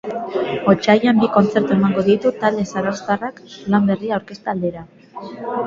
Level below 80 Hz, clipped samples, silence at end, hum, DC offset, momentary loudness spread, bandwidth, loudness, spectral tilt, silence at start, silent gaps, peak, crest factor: -54 dBFS; under 0.1%; 0 s; none; under 0.1%; 16 LU; 7.4 kHz; -18 LUFS; -7 dB/octave; 0.05 s; none; 0 dBFS; 18 dB